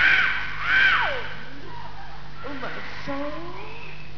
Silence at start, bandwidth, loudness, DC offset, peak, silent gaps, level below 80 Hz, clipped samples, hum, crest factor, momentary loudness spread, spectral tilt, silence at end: 0 s; 5.4 kHz; -23 LUFS; 4%; -6 dBFS; none; -46 dBFS; under 0.1%; 50 Hz at -45 dBFS; 20 dB; 22 LU; -4 dB/octave; 0 s